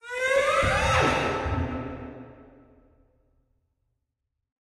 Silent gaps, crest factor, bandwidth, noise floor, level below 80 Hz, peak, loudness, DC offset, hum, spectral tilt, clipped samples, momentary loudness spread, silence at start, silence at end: none; 20 dB; 14 kHz; -82 dBFS; -42 dBFS; -8 dBFS; -24 LUFS; under 0.1%; none; -4.5 dB/octave; under 0.1%; 18 LU; 0.05 s; 2.35 s